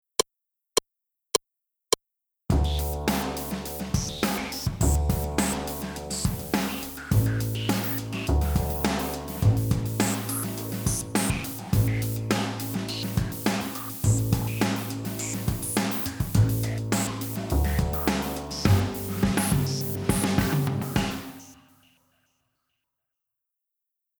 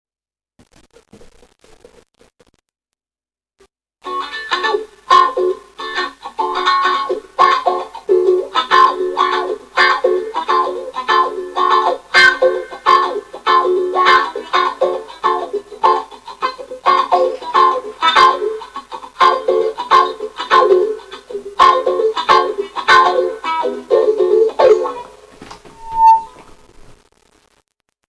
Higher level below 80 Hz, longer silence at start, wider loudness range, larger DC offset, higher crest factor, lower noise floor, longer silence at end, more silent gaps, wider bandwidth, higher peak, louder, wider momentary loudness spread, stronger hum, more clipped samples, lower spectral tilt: first, -36 dBFS vs -52 dBFS; second, 0.2 s vs 4.05 s; about the same, 3 LU vs 5 LU; neither; about the same, 20 dB vs 16 dB; second, -84 dBFS vs under -90 dBFS; first, 2.65 s vs 1.65 s; neither; first, over 20 kHz vs 11 kHz; second, -6 dBFS vs 0 dBFS; second, -27 LUFS vs -14 LUFS; second, 7 LU vs 12 LU; neither; neither; first, -5 dB/octave vs -2.5 dB/octave